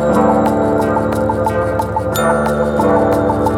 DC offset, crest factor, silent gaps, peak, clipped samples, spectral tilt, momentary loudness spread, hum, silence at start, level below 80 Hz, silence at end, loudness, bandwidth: under 0.1%; 14 dB; none; 0 dBFS; under 0.1%; -7 dB/octave; 4 LU; none; 0 s; -32 dBFS; 0 s; -14 LUFS; 18 kHz